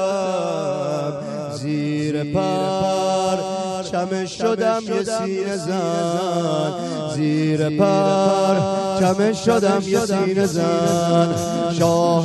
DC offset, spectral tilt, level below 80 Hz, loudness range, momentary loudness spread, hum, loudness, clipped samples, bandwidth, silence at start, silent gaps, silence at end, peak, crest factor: under 0.1%; -6 dB/octave; -54 dBFS; 4 LU; 7 LU; none; -20 LUFS; under 0.1%; 12.5 kHz; 0 s; none; 0 s; -4 dBFS; 16 dB